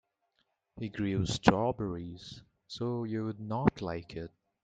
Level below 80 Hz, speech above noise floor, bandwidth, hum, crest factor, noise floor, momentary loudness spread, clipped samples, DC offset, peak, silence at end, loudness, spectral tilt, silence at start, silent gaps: -56 dBFS; 46 dB; 9.2 kHz; none; 32 dB; -78 dBFS; 20 LU; under 0.1%; under 0.1%; -2 dBFS; 0.35 s; -33 LUFS; -6 dB/octave; 0.75 s; none